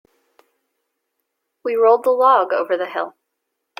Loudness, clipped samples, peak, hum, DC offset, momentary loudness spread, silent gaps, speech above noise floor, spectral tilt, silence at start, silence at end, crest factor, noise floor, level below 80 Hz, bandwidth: -17 LUFS; under 0.1%; -2 dBFS; none; under 0.1%; 14 LU; none; 61 dB; -4 dB/octave; 1.65 s; 0.7 s; 18 dB; -77 dBFS; -78 dBFS; 16 kHz